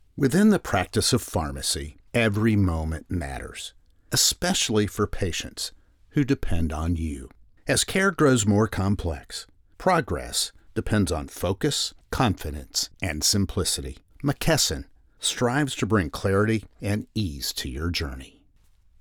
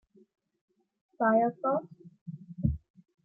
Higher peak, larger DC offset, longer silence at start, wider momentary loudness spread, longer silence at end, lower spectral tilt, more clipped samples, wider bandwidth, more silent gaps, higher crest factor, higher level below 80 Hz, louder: first, -8 dBFS vs -14 dBFS; neither; second, 0.15 s vs 1.2 s; second, 12 LU vs 21 LU; first, 0.75 s vs 0.45 s; second, -4 dB/octave vs -13 dB/octave; neither; first, over 20 kHz vs 2.6 kHz; second, none vs 2.21-2.26 s; about the same, 16 dB vs 20 dB; first, -40 dBFS vs -50 dBFS; first, -25 LUFS vs -29 LUFS